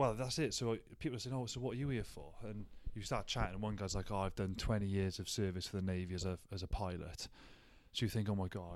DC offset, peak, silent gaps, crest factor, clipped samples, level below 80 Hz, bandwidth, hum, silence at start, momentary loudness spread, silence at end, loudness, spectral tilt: under 0.1%; -22 dBFS; none; 18 dB; under 0.1%; -52 dBFS; 15 kHz; none; 0 s; 12 LU; 0 s; -41 LUFS; -5 dB/octave